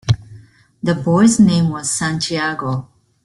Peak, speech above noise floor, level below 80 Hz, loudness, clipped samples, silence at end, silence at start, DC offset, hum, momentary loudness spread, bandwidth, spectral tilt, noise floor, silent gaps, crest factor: -2 dBFS; 28 dB; -46 dBFS; -16 LUFS; under 0.1%; 0.4 s; 0.05 s; under 0.1%; none; 12 LU; 12 kHz; -5 dB/octave; -44 dBFS; none; 16 dB